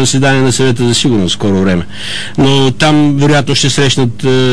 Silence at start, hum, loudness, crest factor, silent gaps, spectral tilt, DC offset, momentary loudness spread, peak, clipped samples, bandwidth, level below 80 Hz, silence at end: 0 s; 50 Hz at -35 dBFS; -10 LUFS; 10 dB; none; -4.5 dB/octave; 9%; 5 LU; -2 dBFS; under 0.1%; 11 kHz; -38 dBFS; 0 s